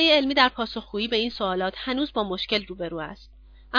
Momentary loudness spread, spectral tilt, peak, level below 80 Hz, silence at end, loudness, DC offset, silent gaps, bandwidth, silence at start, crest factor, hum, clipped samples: 13 LU; -5 dB/octave; -4 dBFS; -50 dBFS; 0 s; -25 LUFS; under 0.1%; none; 5.4 kHz; 0 s; 22 dB; none; under 0.1%